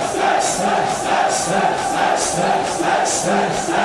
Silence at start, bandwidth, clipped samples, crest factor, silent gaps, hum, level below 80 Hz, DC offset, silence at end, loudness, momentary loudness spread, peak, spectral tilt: 0 s; 12 kHz; under 0.1%; 14 dB; none; none; -50 dBFS; under 0.1%; 0 s; -17 LUFS; 2 LU; -4 dBFS; -3 dB/octave